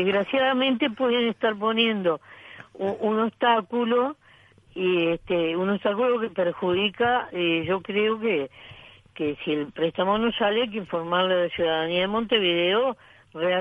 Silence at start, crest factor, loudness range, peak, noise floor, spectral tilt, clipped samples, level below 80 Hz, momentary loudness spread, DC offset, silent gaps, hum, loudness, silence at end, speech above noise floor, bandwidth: 0 s; 18 dB; 2 LU; -8 dBFS; -55 dBFS; -7 dB/octave; under 0.1%; -60 dBFS; 8 LU; under 0.1%; none; none; -24 LUFS; 0 s; 31 dB; 5 kHz